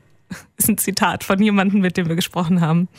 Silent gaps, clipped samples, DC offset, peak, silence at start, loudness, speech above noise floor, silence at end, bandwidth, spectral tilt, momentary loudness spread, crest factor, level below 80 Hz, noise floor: none; under 0.1%; under 0.1%; -2 dBFS; 0.3 s; -18 LUFS; 20 dB; 0.1 s; 16.5 kHz; -5 dB/octave; 13 LU; 16 dB; -52 dBFS; -38 dBFS